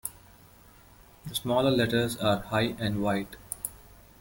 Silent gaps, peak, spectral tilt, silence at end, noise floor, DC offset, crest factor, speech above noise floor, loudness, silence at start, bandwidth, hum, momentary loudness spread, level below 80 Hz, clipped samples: none; -12 dBFS; -5 dB/octave; 0.3 s; -55 dBFS; under 0.1%; 18 dB; 28 dB; -29 LUFS; 0.05 s; 17 kHz; none; 14 LU; -54 dBFS; under 0.1%